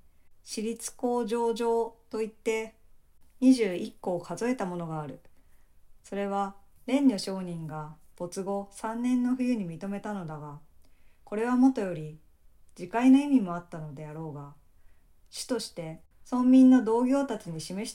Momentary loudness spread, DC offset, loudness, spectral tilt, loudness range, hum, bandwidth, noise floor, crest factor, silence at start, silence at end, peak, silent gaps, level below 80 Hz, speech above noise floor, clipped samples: 19 LU; under 0.1%; -28 LUFS; -6 dB/octave; 6 LU; none; 13 kHz; -56 dBFS; 18 dB; 0.45 s; 0 s; -12 dBFS; none; -60 dBFS; 28 dB; under 0.1%